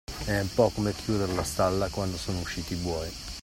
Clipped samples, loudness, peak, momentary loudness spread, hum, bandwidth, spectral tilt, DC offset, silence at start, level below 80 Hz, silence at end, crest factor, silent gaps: under 0.1%; -29 LUFS; -8 dBFS; 7 LU; none; 16 kHz; -5 dB/octave; under 0.1%; 0.1 s; -44 dBFS; 0 s; 20 dB; none